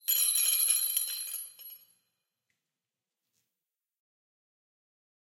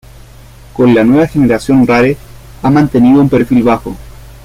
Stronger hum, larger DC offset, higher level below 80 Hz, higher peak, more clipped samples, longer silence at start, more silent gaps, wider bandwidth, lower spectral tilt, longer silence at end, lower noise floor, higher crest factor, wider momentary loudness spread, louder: neither; neither; second, under -90 dBFS vs -34 dBFS; second, -14 dBFS vs 0 dBFS; neither; second, 0.05 s vs 0.75 s; neither; first, 17 kHz vs 15 kHz; second, 6 dB/octave vs -8 dB/octave; first, 3.55 s vs 0.15 s; first, under -90 dBFS vs -35 dBFS; first, 22 dB vs 10 dB; first, 21 LU vs 13 LU; second, -26 LUFS vs -9 LUFS